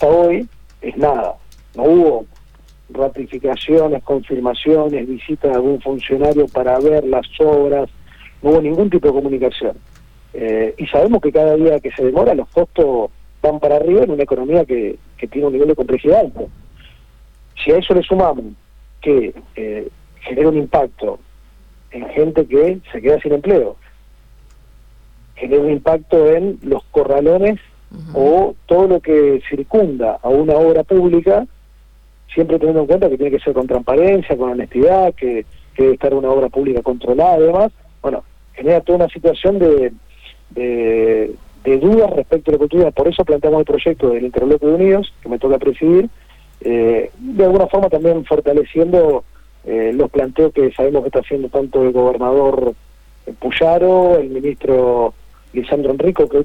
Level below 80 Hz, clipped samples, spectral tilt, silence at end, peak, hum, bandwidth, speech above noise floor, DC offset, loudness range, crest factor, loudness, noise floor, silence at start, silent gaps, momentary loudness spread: -38 dBFS; under 0.1%; -8.5 dB/octave; 0 s; 0 dBFS; none; 5.2 kHz; 31 dB; under 0.1%; 4 LU; 14 dB; -15 LUFS; -44 dBFS; 0 s; none; 12 LU